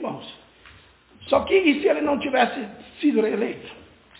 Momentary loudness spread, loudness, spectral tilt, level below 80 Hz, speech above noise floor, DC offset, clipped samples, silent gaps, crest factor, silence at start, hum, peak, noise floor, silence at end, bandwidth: 19 LU; -22 LUFS; -9 dB/octave; -56 dBFS; 31 dB; under 0.1%; under 0.1%; none; 18 dB; 0 s; none; -6 dBFS; -52 dBFS; 0.4 s; 4 kHz